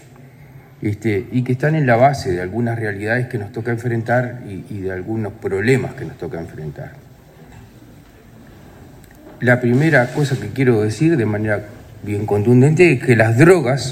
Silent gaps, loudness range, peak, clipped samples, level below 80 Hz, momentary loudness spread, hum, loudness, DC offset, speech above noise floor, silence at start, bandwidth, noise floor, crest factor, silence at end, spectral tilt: none; 9 LU; 0 dBFS; under 0.1%; -50 dBFS; 17 LU; none; -17 LUFS; under 0.1%; 27 dB; 0.25 s; 15.5 kHz; -43 dBFS; 18 dB; 0 s; -7 dB/octave